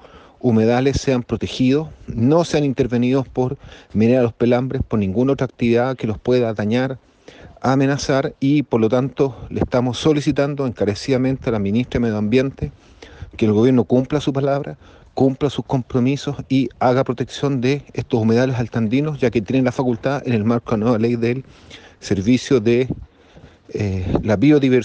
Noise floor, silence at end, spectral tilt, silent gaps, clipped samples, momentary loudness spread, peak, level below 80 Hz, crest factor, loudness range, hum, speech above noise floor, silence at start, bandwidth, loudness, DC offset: -46 dBFS; 0 s; -7 dB/octave; none; under 0.1%; 8 LU; -4 dBFS; -42 dBFS; 14 dB; 2 LU; none; 28 dB; 0.15 s; 8.8 kHz; -19 LUFS; under 0.1%